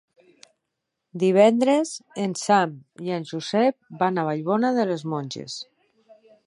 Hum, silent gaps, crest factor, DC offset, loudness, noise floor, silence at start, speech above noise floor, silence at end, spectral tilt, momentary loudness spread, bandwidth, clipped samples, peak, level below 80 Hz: none; none; 20 dB; under 0.1%; -23 LUFS; -81 dBFS; 1.15 s; 59 dB; 0.85 s; -5.5 dB/octave; 16 LU; 11.5 kHz; under 0.1%; -4 dBFS; -76 dBFS